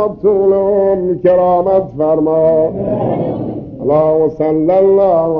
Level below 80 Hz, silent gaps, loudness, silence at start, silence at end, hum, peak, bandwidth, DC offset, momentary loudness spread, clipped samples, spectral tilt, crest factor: -42 dBFS; none; -12 LUFS; 0 s; 0 s; none; 0 dBFS; 4.6 kHz; under 0.1%; 7 LU; under 0.1%; -11.5 dB/octave; 12 dB